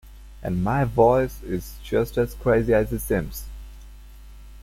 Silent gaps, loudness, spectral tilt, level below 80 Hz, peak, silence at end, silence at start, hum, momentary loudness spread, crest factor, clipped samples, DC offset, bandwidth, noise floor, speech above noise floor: none; -23 LUFS; -7 dB/octave; -38 dBFS; -6 dBFS; 0 s; 0.05 s; none; 16 LU; 18 dB; under 0.1%; under 0.1%; 16.5 kHz; -43 dBFS; 21 dB